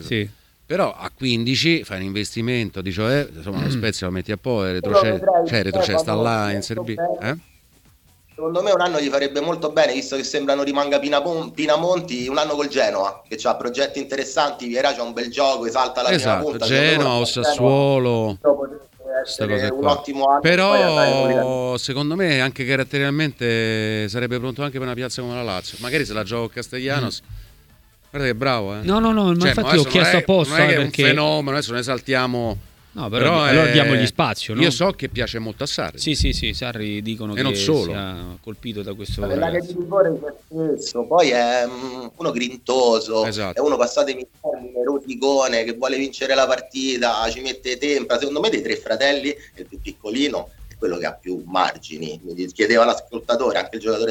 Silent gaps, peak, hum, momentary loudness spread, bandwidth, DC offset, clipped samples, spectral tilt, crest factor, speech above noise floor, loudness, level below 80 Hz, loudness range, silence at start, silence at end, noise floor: none; 0 dBFS; none; 11 LU; 18.5 kHz; under 0.1%; under 0.1%; -4.5 dB/octave; 20 dB; 34 dB; -20 LUFS; -42 dBFS; 6 LU; 0 s; 0 s; -54 dBFS